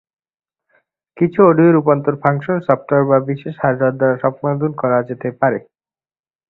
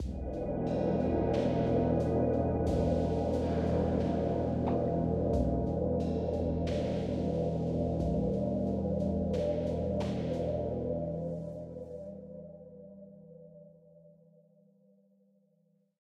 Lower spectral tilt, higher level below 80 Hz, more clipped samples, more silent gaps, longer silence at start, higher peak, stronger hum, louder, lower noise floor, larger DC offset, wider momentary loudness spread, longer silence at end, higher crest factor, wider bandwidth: first, -11.5 dB/octave vs -9 dB/octave; second, -58 dBFS vs -44 dBFS; neither; neither; first, 1.15 s vs 0 s; first, 0 dBFS vs -16 dBFS; neither; first, -16 LUFS vs -32 LUFS; first, under -90 dBFS vs -72 dBFS; neither; second, 8 LU vs 14 LU; second, 0.9 s vs 2.3 s; about the same, 16 dB vs 16 dB; second, 4.1 kHz vs 9 kHz